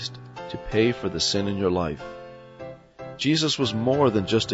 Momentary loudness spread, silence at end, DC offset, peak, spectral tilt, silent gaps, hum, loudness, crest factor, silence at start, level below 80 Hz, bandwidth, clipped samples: 20 LU; 0 s; under 0.1%; -8 dBFS; -5 dB/octave; none; none; -23 LUFS; 16 dB; 0 s; -48 dBFS; 8 kHz; under 0.1%